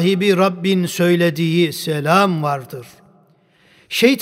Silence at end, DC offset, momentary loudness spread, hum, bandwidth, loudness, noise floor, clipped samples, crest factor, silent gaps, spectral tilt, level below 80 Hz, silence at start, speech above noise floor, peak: 0 s; under 0.1%; 9 LU; none; 16 kHz; -17 LUFS; -54 dBFS; under 0.1%; 16 dB; none; -5.5 dB/octave; -66 dBFS; 0 s; 38 dB; 0 dBFS